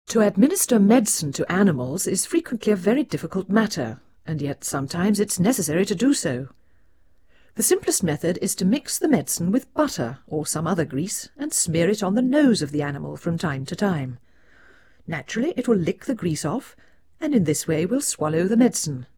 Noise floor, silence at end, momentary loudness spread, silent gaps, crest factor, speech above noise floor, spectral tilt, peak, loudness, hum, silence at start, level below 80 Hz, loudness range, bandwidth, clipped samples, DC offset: -61 dBFS; 0.1 s; 10 LU; none; 18 dB; 40 dB; -5 dB/octave; -4 dBFS; -22 LUFS; none; 0.1 s; -58 dBFS; 5 LU; over 20 kHz; under 0.1%; 0.2%